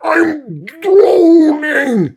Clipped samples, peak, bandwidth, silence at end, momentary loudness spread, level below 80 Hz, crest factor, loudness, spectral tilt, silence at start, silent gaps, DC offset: under 0.1%; 0 dBFS; 12.5 kHz; 0.05 s; 15 LU; -60 dBFS; 10 dB; -10 LUFS; -7 dB/octave; 0 s; none; under 0.1%